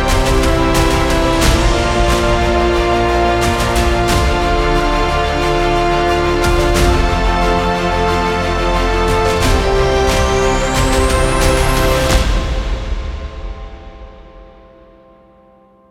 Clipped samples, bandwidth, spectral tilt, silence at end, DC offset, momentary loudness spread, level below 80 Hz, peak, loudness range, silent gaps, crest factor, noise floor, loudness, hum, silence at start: under 0.1%; 16.5 kHz; -5 dB/octave; 1.45 s; under 0.1%; 5 LU; -18 dBFS; 0 dBFS; 5 LU; none; 14 dB; -47 dBFS; -14 LUFS; none; 0 s